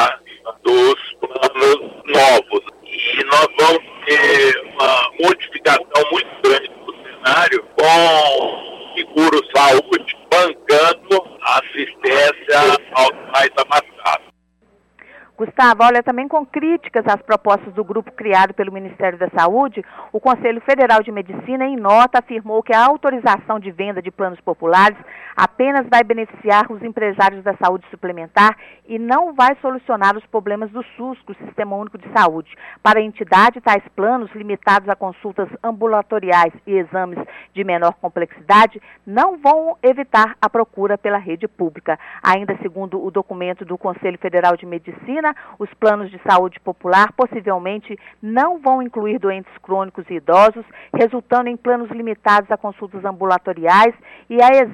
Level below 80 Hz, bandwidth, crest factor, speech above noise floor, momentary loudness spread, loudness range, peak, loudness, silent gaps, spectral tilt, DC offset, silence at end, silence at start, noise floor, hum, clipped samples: -60 dBFS; 15.5 kHz; 14 dB; 42 dB; 14 LU; 5 LU; -2 dBFS; -15 LUFS; none; -4 dB/octave; under 0.1%; 0 s; 0 s; -58 dBFS; none; under 0.1%